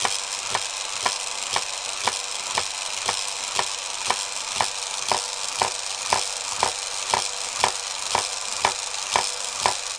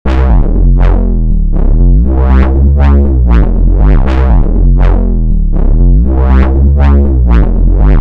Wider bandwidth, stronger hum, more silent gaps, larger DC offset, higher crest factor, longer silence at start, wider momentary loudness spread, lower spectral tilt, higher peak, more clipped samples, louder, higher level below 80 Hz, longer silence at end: first, 10.5 kHz vs 3.8 kHz; neither; neither; neither; first, 26 dB vs 4 dB; about the same, 0 s vs 0.05 s; about the same, 3 LU vs 5 LU; second, 0.5 dB/octave vs -10.5 dB/octave; about the same, 0 dBFS vs 0 dBFS; neither; second, -24 LUFS vs -9 LUFS; second, -60 dBFS vs -6 dBFS; about the same, 0 s vs 0 s